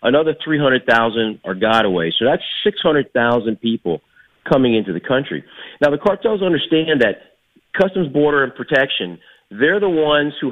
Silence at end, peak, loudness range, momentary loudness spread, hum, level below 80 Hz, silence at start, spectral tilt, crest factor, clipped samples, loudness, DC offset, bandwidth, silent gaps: 0 s; -2 dBFS; 2 LU; 7 LU; none; -52 dBFS; 0 s; -7 dB/octave; 16 dB; under 0.1%; -17 LUFS; under 0.1%; 8 kHz; none